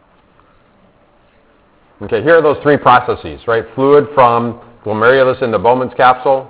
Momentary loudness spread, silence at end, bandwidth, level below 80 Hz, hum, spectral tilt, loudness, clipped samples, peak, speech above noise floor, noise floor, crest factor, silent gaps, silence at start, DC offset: 11 LU; 0.05 s; 4 kHz; -46 dBFS; none; -9.5 dB/octave; -12 LUFS; 0.5%; 0 dBFS; 39 dB; -50 dBFS; 14 dB; none; 2 s; under 0.1%